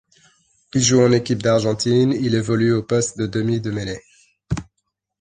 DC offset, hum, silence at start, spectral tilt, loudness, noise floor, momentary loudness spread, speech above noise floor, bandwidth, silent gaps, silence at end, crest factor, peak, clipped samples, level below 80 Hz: under 0.1%; none; 0.75 s; -5 dB/octave; -19 LUFS; -75 dBFS; 13 LU; 57 dB; 9.8 kHz; none; 0.55 s; 18 dB; -2 dBFS; under 0.1%; -46 dBFS